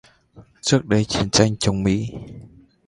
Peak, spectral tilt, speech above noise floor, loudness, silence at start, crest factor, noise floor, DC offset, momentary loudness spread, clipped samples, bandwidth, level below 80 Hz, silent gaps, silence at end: 0 dBFS; -4.5 dB/octave; 30 dB; -20 LUFS; 0.35 s; 22 dB; -49 dBFS; under 0.1%; 15 LU; under 0.1%; 11.5 kHz; -42 dBFS; none; 0.4 s